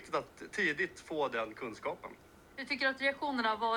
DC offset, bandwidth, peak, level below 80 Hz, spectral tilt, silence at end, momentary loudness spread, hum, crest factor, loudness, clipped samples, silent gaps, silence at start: under 0.1%; 19.5 kHz; -20 dBFS; -70 dBFS; -3.5 dB/octave; 0 s; 14 LU; none; 16 dB; -35 LUFS; under 0.1%; none; 0 s